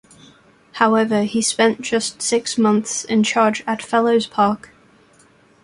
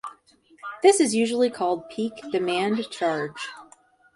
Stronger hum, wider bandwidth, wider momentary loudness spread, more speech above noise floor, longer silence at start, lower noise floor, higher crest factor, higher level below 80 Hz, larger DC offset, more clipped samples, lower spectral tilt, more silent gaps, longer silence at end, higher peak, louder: neither; about the same, 11.5 kHz vs 11.5 kHz; second, 5 LU vs 17 LU; about the same, 35 dB vs 34 dB; first, 0.75 s vs 0.05 s; second, -53 dBFS vs -57 dBFS; about the same, 18 dB vs 20 dB; first, -60 dBFS vs -70 dBFS; neither; neither; about the same, -3.5 dB/octave vs -3.5 dB/octave; neither; first, 1.05 s vs 0.5 s; about the same, -2 dBFS vs -4 dBFS; first, -18 LUFS vs -24 LUFS